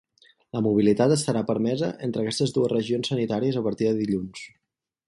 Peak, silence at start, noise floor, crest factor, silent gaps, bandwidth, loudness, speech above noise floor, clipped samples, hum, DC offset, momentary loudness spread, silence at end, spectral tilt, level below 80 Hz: -8 dBFS; 0.55 s; -83 dBFS; 16 dB; none; 11.5 kHz; -24 LUFS; 60 dB; under 0.1%; none; under 0.1%; 9 LU; 0.6 s; -6 dB/octave; -60 dBFS